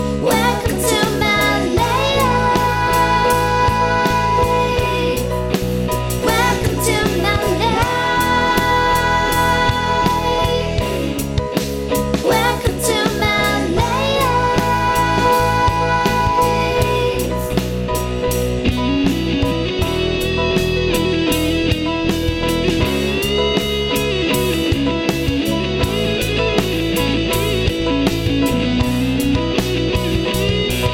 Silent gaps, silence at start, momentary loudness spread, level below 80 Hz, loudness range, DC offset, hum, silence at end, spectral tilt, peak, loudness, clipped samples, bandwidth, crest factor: none; 0 s; 4 LU; -28 dBFS; 2 LU; under 0.1%; none; 0 s; -5 dB/octave; -2 dBFS; -17 LUFS; under 0.1%; over 20 kHz; 14 dB